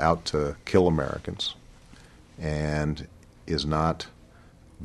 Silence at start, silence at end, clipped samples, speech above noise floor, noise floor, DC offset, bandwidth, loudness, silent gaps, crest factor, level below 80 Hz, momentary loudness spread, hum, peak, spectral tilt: 0 s; 0 s; under 0.1%; 26 dB; -52 dBFS; under 0.1%; 12 kHz; -27 LUFS; none; 22 dB; -42 dBFS; 17 LU; none; -6 dBFS; -6 dB/octave